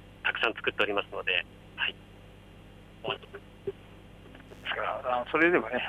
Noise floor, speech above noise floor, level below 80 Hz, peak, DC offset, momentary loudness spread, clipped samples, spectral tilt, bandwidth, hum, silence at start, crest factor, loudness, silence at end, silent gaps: -51 dBFS; 21 dB; -58 dBFS; -10 dBFS; under 0.1%; 24 LU; under 0.1%; -5.5 dB/octave; 13 kHz; 50 Hz at -55 dBFS; 0 s; 22 dB; -30 LUFS; 0 s; none